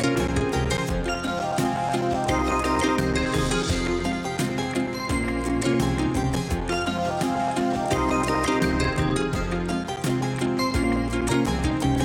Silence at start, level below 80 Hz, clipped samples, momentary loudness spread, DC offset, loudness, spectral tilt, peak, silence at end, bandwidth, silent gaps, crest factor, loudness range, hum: 0 s; -34 dBFS; under 0.1%; 4 LU; under 0.1%; -24 LUFS; -5.5 dB/octave; -10 dBFS; 0 s; 17 kHz; none; 14 dB; 1 LU; none